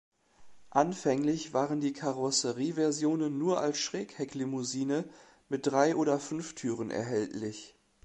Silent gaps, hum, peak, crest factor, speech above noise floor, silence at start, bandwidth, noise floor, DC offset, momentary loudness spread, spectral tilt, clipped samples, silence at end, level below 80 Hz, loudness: none; none; -10 dBFS; 22 dB; 24 dB; 0.4 s; 10.5 kHz; -54 dBFS; under 0.1%; 9 LU; -4.5 dB/octave; under 0.1%; 0.35 s; -72 dBFS; -31 LUFS